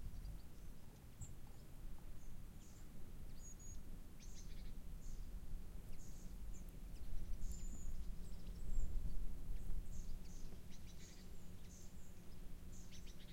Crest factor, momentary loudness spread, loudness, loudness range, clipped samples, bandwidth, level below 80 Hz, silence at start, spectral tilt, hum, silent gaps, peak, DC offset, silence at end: 16 dB; 8 LU; -56 LUFS; 6 LU; under 0.1%; 16 kHz; -48 dBFS; 0 s; -5 dB/octave; none; none; -28 dBFS; under 0.1%; 0 s